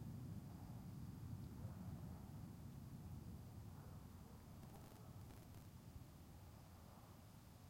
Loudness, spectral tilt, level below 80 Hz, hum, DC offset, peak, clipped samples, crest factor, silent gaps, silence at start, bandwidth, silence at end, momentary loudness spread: -57 LUFS; -7 dB/octave; -66 dBFS; none; under 0.1%; -40 dBFS; under 0.1%; 16 dB; none; 0 s; 16.5 kHz; 0 s; 8 LU